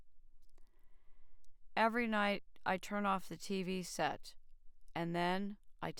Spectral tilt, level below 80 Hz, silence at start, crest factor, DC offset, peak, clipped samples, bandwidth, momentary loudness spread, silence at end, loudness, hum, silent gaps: -5 dB/octave; -62 dBFS; 0 s; 20 dB; under 0.1%; -20 dBFS; under 0.1%; 19.5 kHz; 12 LU; 0 s; -38 LUFS; none; none